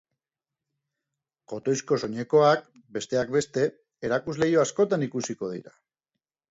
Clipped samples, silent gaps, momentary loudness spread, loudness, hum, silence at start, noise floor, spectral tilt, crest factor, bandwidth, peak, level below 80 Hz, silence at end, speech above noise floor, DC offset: under 0.1%; none; 14 LU; -26 LUFS; none; 1.5 s; -90 dBFS; -5 dB/octave; 20 dB; 8 kHz; -8 dBFS; -64 dBFS; 0.8 s; 65 dB; under 0.1%